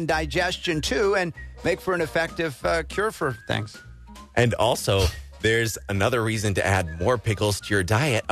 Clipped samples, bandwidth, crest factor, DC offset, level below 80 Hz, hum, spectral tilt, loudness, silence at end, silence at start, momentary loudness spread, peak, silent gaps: under 0.1%; 14 kHz; 16 dB; under 0.1%; -40 dBFS; none; -4.5 dB/octave; -24 LUFS; 0 s; 0 s; 7 LU; -8 dBFS; none